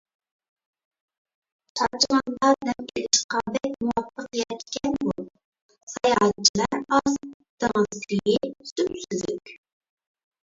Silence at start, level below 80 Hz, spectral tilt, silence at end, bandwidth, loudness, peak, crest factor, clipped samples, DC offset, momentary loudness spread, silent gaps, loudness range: 1.75 s; -58 dBFS; -3 dB/octave; 0.85 s; 8 kHz; -24 LUFS; -4 dBFS; 22 dB; under 0.1%; under 0.1%; 11 LU; 3.24-3.29 s, 5.45-5.52 s, 5.62-5.69 s, 5.83-5.87 s, 6.49-6.54 s, 7.34-7.40 s, 7.49-7.58 s, 8.72-8.76 s; 3 LU